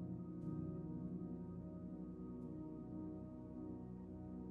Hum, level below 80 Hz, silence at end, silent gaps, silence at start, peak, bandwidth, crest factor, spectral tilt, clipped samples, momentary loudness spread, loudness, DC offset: none; -64 dBFS; 0 s; none; 0 s; -34 dBFS; 2.7 kHz; 14 dB; -12.5 dB/octave; under 0.1%; 5 LU; -50 LUFS; under 0.1%